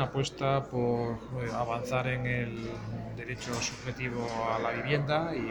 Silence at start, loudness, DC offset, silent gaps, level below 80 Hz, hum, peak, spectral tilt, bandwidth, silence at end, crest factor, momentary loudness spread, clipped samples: 0 s; -32 LUFS; under 0.1%; none; -52 dBFS; none; -14 dBFS; -5.5 dB/octave; 19.5 kHz; 0 s; 18 dB; 8 LU; under 0.1%